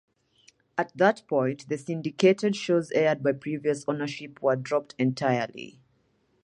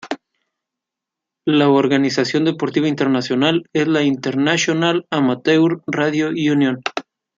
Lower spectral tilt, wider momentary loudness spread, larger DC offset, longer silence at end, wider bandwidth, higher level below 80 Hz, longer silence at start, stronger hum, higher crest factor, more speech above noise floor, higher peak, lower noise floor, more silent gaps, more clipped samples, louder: about the same, -6 dB/octave vs -5 dB/octave; first, 11 LU vs 5 LU; neither; first, 0.75 s vs 0.35 s; first, 11 kHz vs 7.6 kHz; second, -74 dBFS vs -64 dBFS; first, 0.75 s vs 0.05 s; neither; about the same, 20 dB vs 16 dB; second, 43 dB vs 68 dB; second, -6 dBFS vs -2 dBFS; second, -69 dBFS vs -84 dBFS; neither; neither; second, -27 LUFS vs -17 LUFS